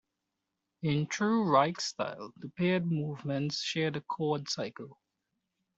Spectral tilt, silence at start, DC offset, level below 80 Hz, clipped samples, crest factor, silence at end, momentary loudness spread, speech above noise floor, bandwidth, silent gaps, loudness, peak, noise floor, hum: -5.5 dB/octave; 0.8 s; under 0.1%; -72 dBFS; under 0.1%; 20 dB; 0.85 s; 13 LU; 54 dB; 8 kHz; none; -31 LUFS; -12 dBFS; -86 dBFS; none